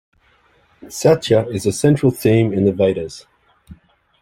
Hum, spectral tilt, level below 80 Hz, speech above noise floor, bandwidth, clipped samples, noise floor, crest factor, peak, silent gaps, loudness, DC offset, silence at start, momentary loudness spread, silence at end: none; -6.5 dB/octave; -50 dBFS; 40 dB; 16.5 kHz; under 0.1%; -56 dBFS; 16 dB; -2 dBFS; none; -16 LUFS; under 0.1%; 0.85 s; 14 LU; 0.5 s